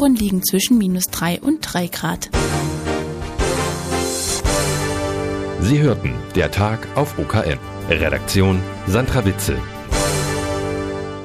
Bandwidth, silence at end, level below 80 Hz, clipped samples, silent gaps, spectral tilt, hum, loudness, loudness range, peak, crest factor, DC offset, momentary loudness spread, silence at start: 15.5 kHz; 0 s; -32 dBFS; under 0.1%; none; -5 dB/octave; none; -19 LUFS; 2 LU; -2 dBFS; 18 dB; under 0.1%; 7 LU; 0 s